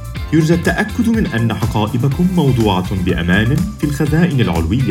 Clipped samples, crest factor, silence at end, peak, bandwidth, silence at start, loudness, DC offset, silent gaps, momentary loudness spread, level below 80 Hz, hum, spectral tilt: under 0.1%; 14 dB; 0 s; 0 dBFS; 16.5 kHz; 0 s; -15 LUFS; under 0.1%; none; 4 LU; -30 dBFS; none; -6.5 dB/octave